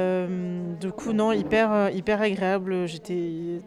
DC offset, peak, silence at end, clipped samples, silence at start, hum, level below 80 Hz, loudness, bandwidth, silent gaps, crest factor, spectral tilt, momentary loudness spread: under 0.1%; -12 dBFS; 0 s; under 0.1%; 0 s; none; -56 dBFS; -25 LUFS; 11.5 kHz; none; 14 dB; -6.5 dB/octave; 9 LU